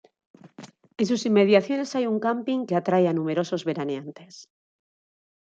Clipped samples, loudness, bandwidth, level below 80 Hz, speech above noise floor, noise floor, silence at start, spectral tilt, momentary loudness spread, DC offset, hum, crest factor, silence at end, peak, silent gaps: under 0.1%; -24 LUFS; 8.6 kHz; -74 dBFS; 24 dB; -47 dBFS; 0.45 s; -6 dB/octave; 13 LU; under 0.1%; none; 20 dB; 1.15 s; -6 dBFS; none